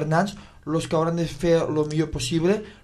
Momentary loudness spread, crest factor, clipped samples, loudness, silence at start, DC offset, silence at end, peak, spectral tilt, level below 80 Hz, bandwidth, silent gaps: 7 LU; 16 dB; under 0.1%; -24 LUFS; 0 s; under 0.1%; 0.1 s; -8 dBFS; -6 dB/octave; -44 dBFS; 13 kHz; none